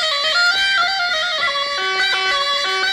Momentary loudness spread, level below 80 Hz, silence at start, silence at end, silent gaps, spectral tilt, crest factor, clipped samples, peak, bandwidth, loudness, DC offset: 4 LU; -56 dBFS; 0 s; 0 s; none; 1 dB/octave; 12 dB; under 0.1%; -6 dBFS; 16 kHz; -16 LUFS; under 0.1%